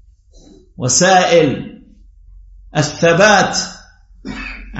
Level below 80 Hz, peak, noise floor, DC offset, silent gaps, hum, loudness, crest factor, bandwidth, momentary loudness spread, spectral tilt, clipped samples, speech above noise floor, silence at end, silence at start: -40 dBFS; 0 dBFS; -45 dBFS; under 0.1%; none; none; -12 LUFS; 16 dB; 8.2 kHz; 18 LU; -3.5 dB/octave; under 0.1%; 33 dB; 0 s; 0.8 s